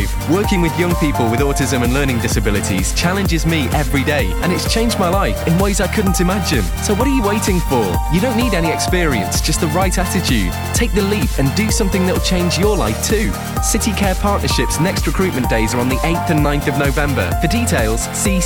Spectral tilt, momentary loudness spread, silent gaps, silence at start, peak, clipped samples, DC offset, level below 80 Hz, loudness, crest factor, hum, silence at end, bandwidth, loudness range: -4.5 dB/octave; 2 LU; none; 0 s; -4 dBFS; under 0.1%; 0.4%; -22 dBFS; -16 LUFS; 12 dB; none; 0 s; over 20 kHz; 0 LU